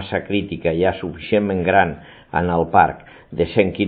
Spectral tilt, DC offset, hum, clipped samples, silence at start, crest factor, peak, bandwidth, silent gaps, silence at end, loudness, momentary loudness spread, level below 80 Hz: -11.5 dB/octave; under 0.1%; none; under 0.1%; 0 s; 18 dB; 0 dBFS; 4.8 kHz; none; 0 s; -19 LUFS; 11 LU; -44 dBFS